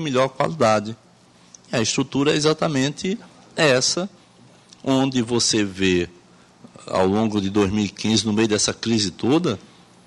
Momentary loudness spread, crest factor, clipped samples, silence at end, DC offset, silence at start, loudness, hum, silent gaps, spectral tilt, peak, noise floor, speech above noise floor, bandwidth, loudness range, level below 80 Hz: 9 LU; 18 dB; under 0.1%; 0.45 s; under 0.1%; 0 s; -20 LUFS; none; none; -4 dB/octave; -4 dBFS; -52 dBFS; 32 dB; 11.5 kHz; 1 LU; -54 dBFS